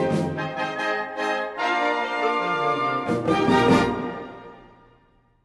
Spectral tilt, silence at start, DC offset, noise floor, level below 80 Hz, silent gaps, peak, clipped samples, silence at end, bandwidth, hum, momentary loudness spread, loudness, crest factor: -6 dB/octave; 0 s; under 0.1%; -60 dBFS; -54 dBFS; none; -6 dBFS; under 0.1%; 0.85 s; 11.5 kHz; none; 10 LU; -23 LUFS; 18 dB